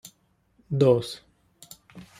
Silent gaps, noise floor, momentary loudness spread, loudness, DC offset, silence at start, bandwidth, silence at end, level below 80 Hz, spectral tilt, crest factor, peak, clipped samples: none; -66 dBFS; 25 LU; -23 LUFS; under 0.1%; 0.7 s; 15.5 kHz; 0.15 s; -62 dBFS; -7 dB/octave; 20 dB; -8 dBFS; under 0.1%